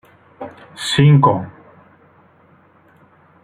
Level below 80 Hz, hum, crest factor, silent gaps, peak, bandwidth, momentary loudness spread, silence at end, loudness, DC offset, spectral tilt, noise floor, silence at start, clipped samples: -54 dBFS; none; 18 dB; none; -2 dBFS; 11.5 kHz; 24 LU; 1.95 s; -14 LUFS; under 0.1%; -6.5 dB/octave; -51 dBFS; 0.4 s; under 0.1%